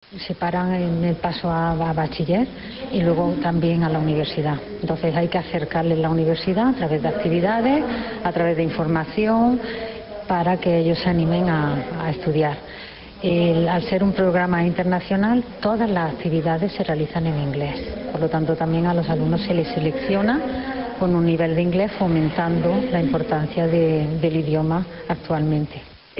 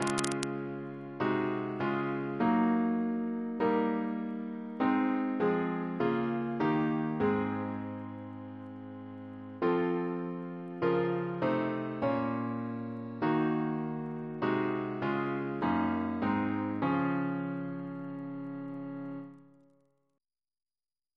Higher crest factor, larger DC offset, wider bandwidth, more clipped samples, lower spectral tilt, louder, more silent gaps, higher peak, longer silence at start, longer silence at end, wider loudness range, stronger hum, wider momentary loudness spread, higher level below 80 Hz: second, 14 dB vs 24 dB; neither; second, 5.6 kHz vs 11 kHz; neither; first, -10 dB/octave vs -6.5 dB/octave; first, -21 LUFS vs -33 LUFS; neither; about the same, -8 dBFS vs -8 dBFS; about the same, 0.1 s vs 0 s; second, 0 s vs 1.7 s; second, 2 LU vs 5 LU; neither; second, 7 LU vs 12 LU; first, -44 dBFS vs -68 dBFS